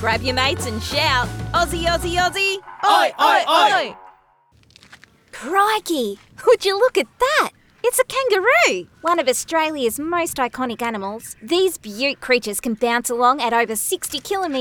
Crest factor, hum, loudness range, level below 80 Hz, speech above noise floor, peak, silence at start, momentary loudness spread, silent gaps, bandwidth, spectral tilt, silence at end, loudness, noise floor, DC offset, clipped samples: 16 dB; none; 4 LU; -42 dBFS; 37 dB; -4 dBFS; 0 s; 9 LU; none; over 20 kHz; -3 dB/octave; 0 s; -19 LUFS; -56 dBFS; under 0.1%; under 0.1%